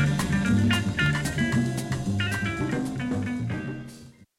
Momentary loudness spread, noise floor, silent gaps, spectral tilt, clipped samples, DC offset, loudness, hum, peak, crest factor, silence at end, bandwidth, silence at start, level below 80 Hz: 9 LU; -47 dBFS; none; -5.5 dB/octave; under 0.1%; under 0.1%; -26 LUFS; none; -12 dBFS; 14 dB; 0.25 s; 16 kHz; 0 s; -44 dBFS